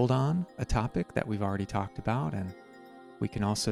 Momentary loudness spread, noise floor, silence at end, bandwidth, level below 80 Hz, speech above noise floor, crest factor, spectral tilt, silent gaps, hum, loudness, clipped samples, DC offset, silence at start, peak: 18 LU; -51 dBFS; 0 s; 13 kHz; -46 dBFS; 21 dB; 20 dB; -6 dB/octave; none; none; -32 LUFS; under 0.1%; under 0.1%; 0 s; -12 dBFS